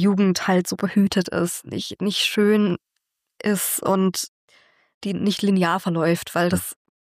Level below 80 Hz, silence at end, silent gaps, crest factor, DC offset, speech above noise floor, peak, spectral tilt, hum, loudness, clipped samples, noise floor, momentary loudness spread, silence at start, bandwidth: -60 dBFS; 0.35 s; 4.28-4.48 s, 4.94-5.01 s; 14 dB; under 0.1%; 57 dB; -8 dBFS; -5 dB/octave; none; -21 LUFS; under 0.1%; -78 dBFS; 10 LU; 0 s; 15.5 kHz